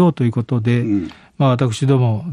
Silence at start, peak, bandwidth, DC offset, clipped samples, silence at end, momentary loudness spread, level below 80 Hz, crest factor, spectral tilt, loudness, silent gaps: 0 s; -2 dBFS; 10.5 kHz; under 0.1%; under 0.1%; 0 s; 5 LU; -52 dBFS; 14 dB; -8 dB/octave; -17 LUFS; none